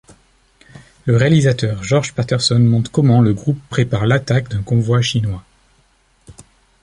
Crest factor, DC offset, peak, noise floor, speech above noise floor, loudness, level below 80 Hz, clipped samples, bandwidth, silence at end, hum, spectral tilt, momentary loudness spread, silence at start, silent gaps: 16 dB; under 0.1%; 0 dBFS; -57 dBFS; 42 dB; -16 LUFS; -42 dBFS; under 0.1%; 11 kHz; 0.5 s; none; -6 dB/octave; 7 LU; 0.75 s; none